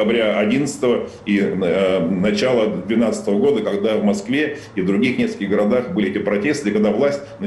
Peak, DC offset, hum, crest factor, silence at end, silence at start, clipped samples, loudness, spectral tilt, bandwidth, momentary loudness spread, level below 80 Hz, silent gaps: -8 dBFS; under 0.1%; none; 10 dB; 0 s; 0 s; under 0.1%; -19 LUFS; -6 dB/octave; 12 kHz; 4 LU; -54 dBFS; none